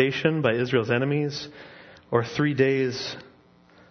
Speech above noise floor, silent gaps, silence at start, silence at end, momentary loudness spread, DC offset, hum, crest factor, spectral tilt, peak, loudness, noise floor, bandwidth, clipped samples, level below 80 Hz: 31 dB; none; 0 s; 0.65 s; 18 LU; under 0.1%; none; 20 dB; -6.5 dB/octave; -6 dBFS; -25 LUFS; -56 dBFS; 6.6 kHz; under 0.1%; -64 dBFS